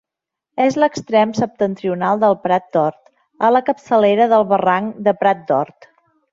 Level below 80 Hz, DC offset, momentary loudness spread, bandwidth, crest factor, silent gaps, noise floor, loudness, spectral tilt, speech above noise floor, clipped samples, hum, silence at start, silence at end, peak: -62 dBFS; under 0.1%; 6 LU; 7.6 kHz; 14 dB; none; -84 dBFS; -17 LUFS; -6.5 dB/octave; 68 dB; under 0.1%; none; 0.55 s; 0.7 s; -2 dBFS